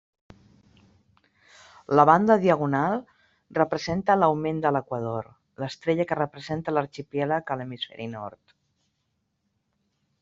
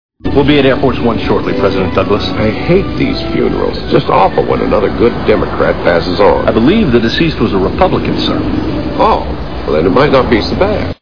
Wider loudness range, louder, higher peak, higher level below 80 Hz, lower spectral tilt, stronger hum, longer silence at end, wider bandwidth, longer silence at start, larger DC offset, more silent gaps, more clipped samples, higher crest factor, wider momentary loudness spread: first, 9 LU vs 2 LU; second, -25 LUFS vs -11 LUFS; second, -4 dBFS vs 0 dBFS; second, -62 dBFS vs -26 dBFS; second, -5 dB/octave vs -7.5 dB/octave; neither; first, 1.9 s vs 0 s; first, 7.8 kHz vs 5.4 kHz; first, 1.9 s vs 0.1 s; second, under 0.1% vs 6%; neither; second, under 0.1% vs 0.3%; first, 24 dB vs 12 dB; first, 16 LU vs 6 LU